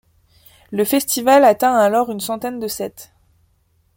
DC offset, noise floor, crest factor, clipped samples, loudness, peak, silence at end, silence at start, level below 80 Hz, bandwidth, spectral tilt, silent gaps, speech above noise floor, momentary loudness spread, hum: under 0.1%; -61 dBFS; 16 dB; under 0.1%; -17 LUFS; -2 dBFS; 0.9 s; 0.7 s; -58 dBFS; 17 kHz; -3.5 dB/octave; none; 44 dB; 14 LU; none